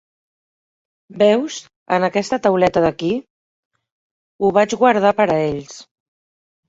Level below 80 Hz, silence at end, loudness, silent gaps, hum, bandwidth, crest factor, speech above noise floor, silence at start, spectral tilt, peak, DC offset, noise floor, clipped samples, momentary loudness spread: -54 dBFS; 0.85 s; -17 LUFS; 1.76-1.86 s, 3.30-3.71 s, 3.92-4.39 s; none; 8 kHz; 18 dB; over 74 dB; 1.1 s; -5.5 dB/octave; -2 dBFS; under 0.1%; under -90 dBFS; under 0.1%; 12 LU